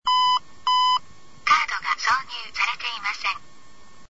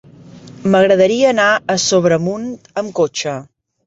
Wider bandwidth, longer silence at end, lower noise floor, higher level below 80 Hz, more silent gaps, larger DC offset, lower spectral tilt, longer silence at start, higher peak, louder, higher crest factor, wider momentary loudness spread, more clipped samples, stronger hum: about the same, 8 kHz vs 8 kHz; second, 0 s vs 0.4 s; first, -52 dBFS vs -38 dBFS; about the same, -60 dBFS vs -56 dBFS; neither; first, 0.9% vs under 0.1%; second, 1 dB/octave vs -4 dB/octave; second, 0 s vs 0.35 s; second, -6 dBFS vs -2 dBFS; second, -23 LUFS vs -15 LUFS; about the same, 18 dB vs 14 dB; second, 8 LU vs 12 LU; neither; neither